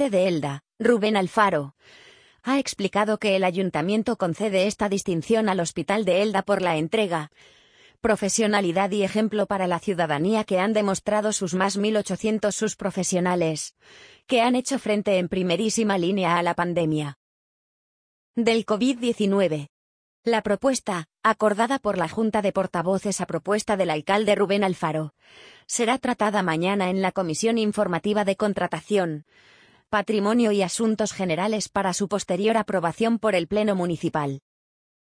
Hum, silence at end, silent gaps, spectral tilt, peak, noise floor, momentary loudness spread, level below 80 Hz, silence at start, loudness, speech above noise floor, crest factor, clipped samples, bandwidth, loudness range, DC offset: none; 0.65 s; 17.16-18.34 s, 19.69-20.23 s; -4.5 dB/octave; -6 dBFS; under -90 dBFS; 5 LU; -60 dBFS; 0 s; -24 LUFS; over 67 dB; 18 dB; under 0.1%; 10.5 kHz; 2 LU; under 0.1%